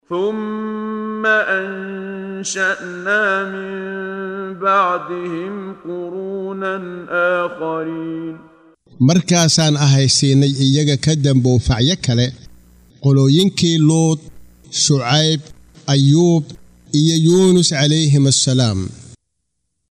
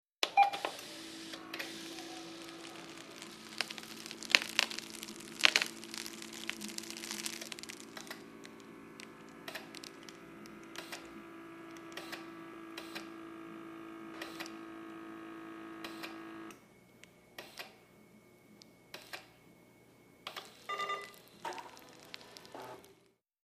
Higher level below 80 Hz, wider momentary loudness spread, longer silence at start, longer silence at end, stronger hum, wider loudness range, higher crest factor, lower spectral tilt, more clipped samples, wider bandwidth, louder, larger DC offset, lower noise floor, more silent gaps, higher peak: first, -44 dBFS vs -80 dBFS; second, 14 LU vs 21 LU; about the same, 0.1 s vs 0.2 s; first, 0.8 s vs 0.5 s; neither; second, 7 LU vs 17 LU; second, 14 dB vs 40 dB; first, -4.5 dB/octave vs -1 dB/octave; neither; second, 11.5 kHz vs 15.5 kHz; first, -16 LUFS vs -39 LUFS; neither; about the same, -73 dBFS vs -70 dBFS; neither; about the same, -2 dBFS vs 0 dBFS